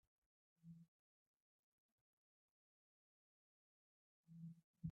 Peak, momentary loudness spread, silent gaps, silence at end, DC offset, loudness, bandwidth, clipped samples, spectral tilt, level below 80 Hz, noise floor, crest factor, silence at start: -38 dBFS; 10 LU; 0.88-4.24 s, 4.64-4.74 s; 0 s; under 0.1%; -61 LUFS; 1.2 kHz; under 0.1%; -18 dB/octave; -84 dBFS; under -90 dBFS; 26 dB; 0.65 s